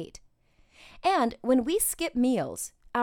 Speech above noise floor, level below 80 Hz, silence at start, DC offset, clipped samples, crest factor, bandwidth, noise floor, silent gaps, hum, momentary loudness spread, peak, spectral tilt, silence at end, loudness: 37 dB; -56 dBFS; 0 s; under 0.1%; under 0.1%; 16 dB; 18.5 kHz; -63 dBFS; none; none; 9 LU; -12 dBFS; -3.5 dB/octave; 0 s; -27 LUFS